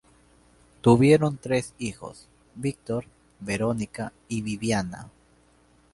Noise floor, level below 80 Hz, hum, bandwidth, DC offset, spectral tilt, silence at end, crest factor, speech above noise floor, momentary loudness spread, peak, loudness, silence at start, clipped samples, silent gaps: -60 dBFS; -54 dBFS; none; 11.5 kHz; under 0.1%; -6.5 dB/octave; 0.85 s; 24 dB; 35 dB; 18 LU; -4 dBFS; -25 LUFS; 0.85 s; under 0.1%; none